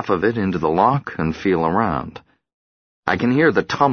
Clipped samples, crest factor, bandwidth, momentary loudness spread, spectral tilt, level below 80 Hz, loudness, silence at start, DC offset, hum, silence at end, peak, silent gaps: under 0.1%; 18 dB; 6.6 kHz; 9 LU; -7.5 dB/octave; -46 dBFS; -19 LUFS; 0 s; under 0.1%; none; 0 s; -2 dBFS; 2.53-3.03 s